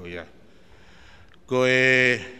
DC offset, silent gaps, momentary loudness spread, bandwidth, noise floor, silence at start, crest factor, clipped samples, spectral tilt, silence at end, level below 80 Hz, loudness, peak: 0.3%; none; 21 LU; 11.5 kHz; -53 dBFS; 0 s; 20 dB; under 0.1%; -4.5 dB/octave; 0 s; -58 dBFS; -19 LUFS; -4 dBFS